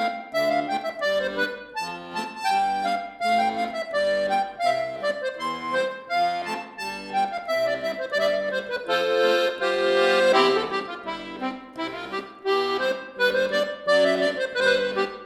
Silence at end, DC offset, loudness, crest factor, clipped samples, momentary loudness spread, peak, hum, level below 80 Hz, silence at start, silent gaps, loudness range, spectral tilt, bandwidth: 0 s; under 0.1%; -24 LUFS; 18 dB; under 0.1%; 11 LU; -6 dBFS; none; -64 dBFS; 0 s; none; 4 LU; -3.5 dB/octave; 16.5 kHz